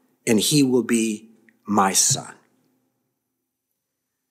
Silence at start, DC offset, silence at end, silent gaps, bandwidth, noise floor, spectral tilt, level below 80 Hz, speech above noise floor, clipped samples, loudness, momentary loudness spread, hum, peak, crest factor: 0.25 s; under 0.1%; 2 s; none; 16 kHz; -79 dBFS; -3.5 dB/octave; -70 dBFS; 60 dB; under 0.1%; -19 LUFS; 9 LU; none; -4 dBFS; 20 dB